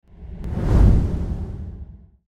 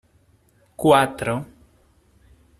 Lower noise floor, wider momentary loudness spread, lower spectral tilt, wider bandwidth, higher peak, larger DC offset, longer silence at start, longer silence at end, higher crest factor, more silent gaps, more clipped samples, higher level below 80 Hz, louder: second, -40 dBFS vs -59 dBFS; first, 24 LU vs 14 LU; first, -9.5 dB/octave vs -5.5 dB/octave; second, 6.6 kHz vs 15 kHz; about the same, -4 dBFS vs -2 dBFS; neither; second, 0.2 s vs 0.8 s; second, 0.35 s vs 1.15 s; second, 16 dB vs 22 dB; neither; neither; first, -22 dBFS vs -54 dBFS; about the same, -21 LUFS vs -20 LUFS